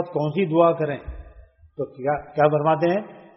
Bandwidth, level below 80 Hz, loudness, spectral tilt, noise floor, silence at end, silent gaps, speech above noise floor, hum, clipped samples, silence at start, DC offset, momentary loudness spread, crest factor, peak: 5.8 kHz; -46 dBFS; -21 LUFS; -6.5 dB/octave; -49 dBFS; 0.2 s; none; 28 dB; none; under 0.1%; 0 s; under 0.1%; 17 LU; 20 dB; -4 dBFS